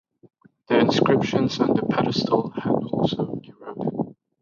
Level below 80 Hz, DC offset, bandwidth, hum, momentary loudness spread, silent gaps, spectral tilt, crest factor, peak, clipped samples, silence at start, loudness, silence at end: -58 dBFS; under 0.1%; 7.4 kHz; none; 12 LU; none; -6.5 dB/octave; 18 dB; -6 dBFS; under 0.1%; 0.7 s; -23 LUFS; 0.3 s